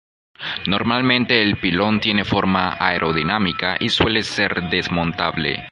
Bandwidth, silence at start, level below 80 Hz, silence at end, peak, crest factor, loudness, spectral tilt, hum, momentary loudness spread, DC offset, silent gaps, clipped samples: 11 kHz; 0.4 s; -42 dBFS; 0 s; -2 dBFS; 18 dB; -18 LUFS; -5.5 dB/octave; none; 5 LU; under 0.1%; none; under 0.1%